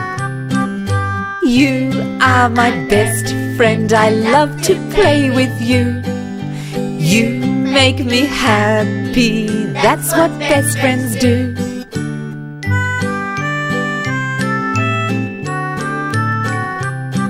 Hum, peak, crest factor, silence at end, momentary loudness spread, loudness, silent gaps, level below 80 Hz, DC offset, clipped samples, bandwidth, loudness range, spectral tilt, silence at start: none; 0 dBFS; 14 dB; 0 s; 10 LU; -15 LUFS; none; -40 dBFS; under 0.1%; under 0.1%; 16 kHz; 5 LU; -5 dB/octave; 0 s